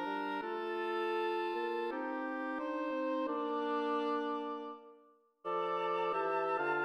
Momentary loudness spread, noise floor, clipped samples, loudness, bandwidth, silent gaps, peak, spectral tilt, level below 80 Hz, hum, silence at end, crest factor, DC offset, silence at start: 6 LU; -66 dBFS; under 0.1%; -36 LUFS; 13.5 kHz; none; -24 dBFS; -5.5 dB/octave; -84 dBFS; none; 0 s; 14 dB; under 0.1%; 0 s